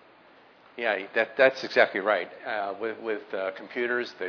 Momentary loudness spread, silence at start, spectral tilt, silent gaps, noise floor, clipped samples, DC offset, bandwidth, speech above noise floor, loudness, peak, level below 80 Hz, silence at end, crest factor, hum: 11 LU; 0.8 s; -4.5 dB/octave; none; -55 dBFS; under 0.1%; under 0.1%; 5.4 kHz; 28 dB; -27 LUFS; -6 dBFS; -80 dBFS; 0 s; 22 dB; none